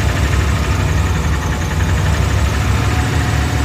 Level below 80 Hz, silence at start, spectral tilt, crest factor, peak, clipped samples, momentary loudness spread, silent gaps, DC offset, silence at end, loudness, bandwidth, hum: -18 dBFS; 0 s; -5.5 dB/octave; 12 dB; -2 dBFS; under 0.1%; 2 LU; none; under 0.1%; 0 s; -16 LUFS; 16 kHz; none